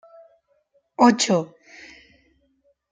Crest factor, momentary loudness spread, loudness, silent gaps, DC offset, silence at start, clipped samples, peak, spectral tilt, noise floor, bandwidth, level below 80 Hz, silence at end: 22 dB; 27 LU; -19 LUFS; none; under 0.1%; 1 s; under 0.1%; -2 dBFS; -4 dB/octave; -66 dBFS; 9.6 kHz; -68 dBFS; 1.45 s